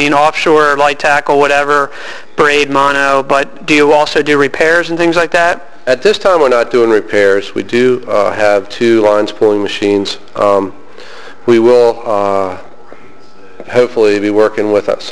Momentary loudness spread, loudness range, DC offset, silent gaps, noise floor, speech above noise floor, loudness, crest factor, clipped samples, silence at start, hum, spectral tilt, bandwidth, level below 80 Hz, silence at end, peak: 6 LU; 3 LU; 4%; none; -39 dBFS; 28 dB; -11 LUFS; 10 dB; under 0.1%; 0 s; none; -4.5 dB/octave; 11 kHz; -48 dBFS; 0 s; 0 dBFS